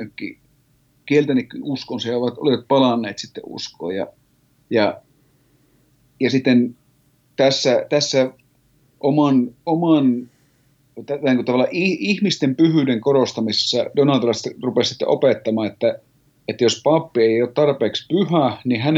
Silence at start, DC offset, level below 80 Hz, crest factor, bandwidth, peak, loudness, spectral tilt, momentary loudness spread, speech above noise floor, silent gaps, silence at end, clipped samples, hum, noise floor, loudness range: 0 s; under 0.1%; -68 dBFS; 16 dB; 8 kHz; -4 dBFS; -19 LUFS; -5.5 dB/octave; 12 LU; 41 dB; none; 0 s; under 0.1%; none; -60 dBFS; 4 LU